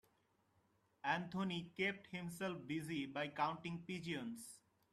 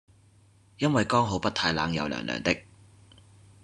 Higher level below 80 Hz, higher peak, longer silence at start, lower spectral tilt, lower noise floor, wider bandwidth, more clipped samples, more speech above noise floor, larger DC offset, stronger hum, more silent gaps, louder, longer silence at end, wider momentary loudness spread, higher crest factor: second, -80 dBFS vs -56 dBFS; second, -26 dBFS vs -6 dBFS; first, 1.05 s vs 0.8 s; about the same, -5 dB/octave vs -5 dB/octave; first, -79 dBFS vs -59 dBFS; first, 14 kHz vs 11 kHz; neither; about the same, 35 dB vs 33 dB; neither; neither; neither; second, -44 LUFS vs -27 LUFS; second, 0.35 s vs 1.05 s; about the same, 8 LU vs 6 LU; about the same, 20 dB vs 22 dB